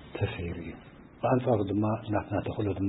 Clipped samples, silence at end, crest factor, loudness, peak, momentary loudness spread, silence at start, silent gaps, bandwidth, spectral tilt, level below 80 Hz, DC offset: under 0.1%; 0 s; 18 dB; -30 LUFS; -12 dBFS; 13 LU; 0 s; none; 4 kHz; -11.5 dB/octave; -52 dBFS; under 0.1%